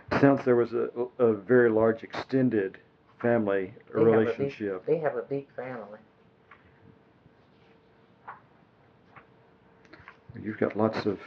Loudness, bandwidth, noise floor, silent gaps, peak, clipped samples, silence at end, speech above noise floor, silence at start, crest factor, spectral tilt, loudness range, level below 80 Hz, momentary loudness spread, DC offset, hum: -27 LUFS; 6.6 kHz; -60 dBFS; none; -6 dBFS; under 0.1%; 0 s; 34 dB; 0.1 s; 22 dB; -8.5 dB/octave; 17 LU; -66 dBFS; 17 LU; under 0.1%; none